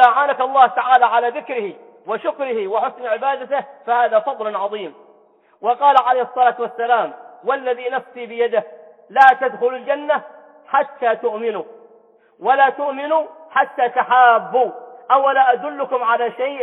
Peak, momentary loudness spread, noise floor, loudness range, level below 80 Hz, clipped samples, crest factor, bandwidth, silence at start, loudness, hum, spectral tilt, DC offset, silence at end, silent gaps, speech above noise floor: 0 dBFS; 12 LU; -54 dBFS; 5 LU; -78 dBFS; under 0.1%; 18 dB; 5.4 kHz; 0 s; -18 LUFS; none; -5 dB/octave; under 0.1%; 0 s; none; 36 dB